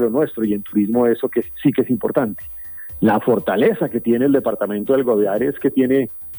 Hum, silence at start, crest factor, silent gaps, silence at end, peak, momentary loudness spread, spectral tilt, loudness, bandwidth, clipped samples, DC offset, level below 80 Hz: none; 0 s; 14 dB; none; 0 s; -4 dBFS; 6 LU; -9.5 dB/octave; -18 LUFS; over 20 kHz; under 0.1%; under 0.1%; -52 dBFS